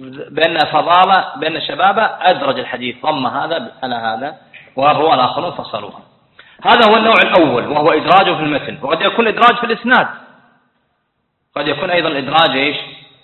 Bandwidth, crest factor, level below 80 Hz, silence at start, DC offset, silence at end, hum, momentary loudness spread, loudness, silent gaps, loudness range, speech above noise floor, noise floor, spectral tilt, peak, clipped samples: 7.6 kHz; 14 dB; -56 dBFS; 0 s; under 0.1%; 0.25 s; none; 13 LU; -13 LUFS; none; 5 LU; 54 dB; -67 dBFS; -6 dB/octave; 0 dBFS; under 0.1%